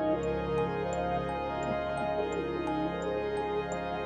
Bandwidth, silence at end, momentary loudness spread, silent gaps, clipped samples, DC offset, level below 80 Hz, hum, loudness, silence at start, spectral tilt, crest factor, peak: 9.8 kHz; 0 s; 2 LU; none; under 0.1%; under 0.1%; -48 dBFS; none; -32 LUFS; 0 s; -6.5 dB/octave; 12 dB; -20 dBFS